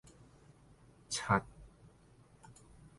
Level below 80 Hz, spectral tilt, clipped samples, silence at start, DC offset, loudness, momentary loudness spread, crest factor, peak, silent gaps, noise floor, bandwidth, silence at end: -62 dBFS; -4 dB/octave; under 0.1%; 1.1 s; under 0.1%; -35 LUFS; 28 LU; 26 dB; -16 dBFS; none; -63 dBFS; 11.5 kHz; 0.45 s